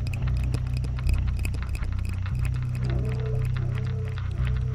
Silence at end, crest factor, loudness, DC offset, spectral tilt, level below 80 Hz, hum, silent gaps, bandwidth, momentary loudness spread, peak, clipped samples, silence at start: 0 s; 14 dB; -28 LUFS; under 0.1%; -7.5 dB/octave; -30 dBFS; none; none; 13.5 kHz; 3 LU; -12 dBFS; under 0.1%; 0 s